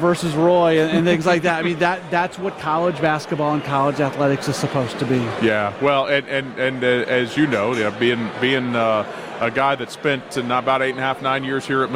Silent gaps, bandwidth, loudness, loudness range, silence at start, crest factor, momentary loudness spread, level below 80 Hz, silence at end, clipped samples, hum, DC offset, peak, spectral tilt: none; 16 kHz; -19 LUFS; 2 LU; 0 s; 14 dB; 6 LU; -56 dBFS; 0 s; under 0.1%; none; under 0.1%; -4 dBFS; -5.5 dB/octave